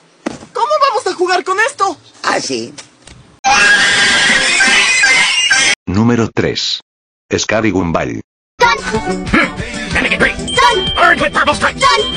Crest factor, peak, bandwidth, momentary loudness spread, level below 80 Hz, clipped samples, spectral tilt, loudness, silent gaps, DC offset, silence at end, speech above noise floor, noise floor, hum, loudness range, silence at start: 14 dB; 0 dBFS; 13 kHz; 12 LU; -36 dBFS; under 0.1%; -2.5 dB/octave; -11 LUFS; 3.39-3.44 s, 5.76-5.86 s, 6.82-7.29 s, 8.24-8.58 s; under 0.1%; 0 s; 26 dB; -40 dBFS; none; 7 LU; 0.25 s